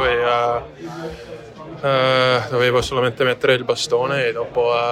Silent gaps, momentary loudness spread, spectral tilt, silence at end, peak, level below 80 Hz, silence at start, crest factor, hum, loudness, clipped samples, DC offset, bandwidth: none; 16 LU; -4.5 dB/octave; 0 s; -2 dBFS; -46 dBFS; 0 s; 16 dB; none; -18 LUFS; under 0.1%; under 0.1%; 14 kHz